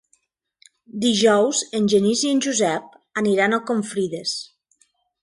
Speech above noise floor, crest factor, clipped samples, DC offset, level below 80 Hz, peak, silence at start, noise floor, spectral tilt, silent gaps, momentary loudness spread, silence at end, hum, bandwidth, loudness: 46 dB; 18 dB; under 0.1%; under 0.1%; -66 dBFS; -4 dBFS; 0.95 s; -66 dBFS; -3.5 dB/octave; none; 13 LU; 0.8 s; none; 11.5 kHz; -20 LUFS